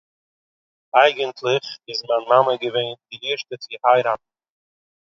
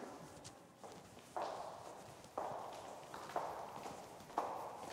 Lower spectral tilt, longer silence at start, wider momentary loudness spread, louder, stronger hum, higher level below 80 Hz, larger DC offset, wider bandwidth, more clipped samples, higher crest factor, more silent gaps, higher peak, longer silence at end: about the same, -4 dB/octave vs -4 dB/octave; first, 0.95 s vs 0 s; about the same, 12 LU vs 12 LU; first, -20 LUFS vs -49 LUFS; neither; about the same, -74 dBFS vs -78 dBFS; neither; second, 7.4 kHz vs 16 kHz; neither; about the same, 22 dB vs 26 dB; neither; first, 0 dBFS vs -22 dBFS; first, 0.9 s vs 0 s